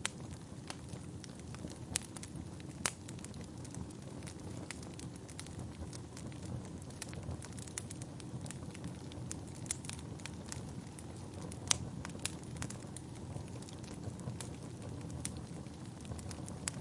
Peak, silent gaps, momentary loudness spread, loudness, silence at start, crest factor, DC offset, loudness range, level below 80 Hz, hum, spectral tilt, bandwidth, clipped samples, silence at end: -2 dBFS; none; 8 LU; -44 LUFS; 0 s; 42 dB; under 0.1%; 5 LU; -60 dBFS; none; -3.5 dB/octave; 11.5 kHz; under 0.1%; 0 s